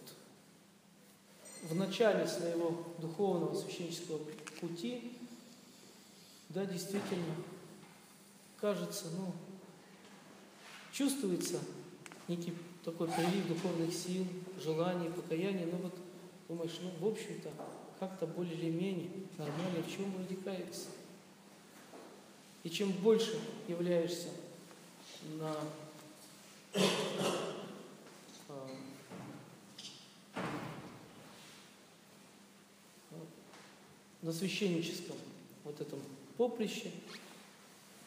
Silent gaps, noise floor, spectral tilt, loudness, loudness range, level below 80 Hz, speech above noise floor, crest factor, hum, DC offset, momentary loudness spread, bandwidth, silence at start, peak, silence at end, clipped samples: none; -63 dBFS; -5 dB/octave; -39 LUFS; 11 LU; -88 dBFS; 25 dB; 22 dB; none; under 0.1%; 22 LU; 15.5 kHz; 0 s; -18 dBFS; 0 s; under 0.1%